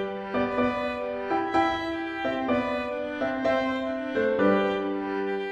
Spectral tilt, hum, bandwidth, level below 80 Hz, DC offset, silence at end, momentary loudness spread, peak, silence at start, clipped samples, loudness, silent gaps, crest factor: -6.5 dB/octave; none; 9 kHz; -56 dBFS; under 0.1%; 0 s; 7 LU; -10 dBFS; 0 s; under 0.1%; -27 LUFS; none; 18 dB